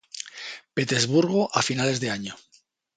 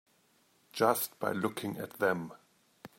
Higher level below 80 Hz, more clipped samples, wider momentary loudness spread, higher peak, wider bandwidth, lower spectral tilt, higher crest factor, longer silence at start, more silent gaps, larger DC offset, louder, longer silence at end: first, -64 dBFS vs -78 dBFS; neither; first, 16 LU vs 12 LU; first, -4 dBFS vs -12 dBFS; second, 9.6 kHz vs 16 kHz; about the same, -4 dB/octave vs -4.5 dB/octave; about the same, 22 dB vs 22 dB; second, 0.15 s vs 0.75 s; neither; neither; first, -24 LUFS vs -33 LUFS; first, 0.6 s vs 0.1 s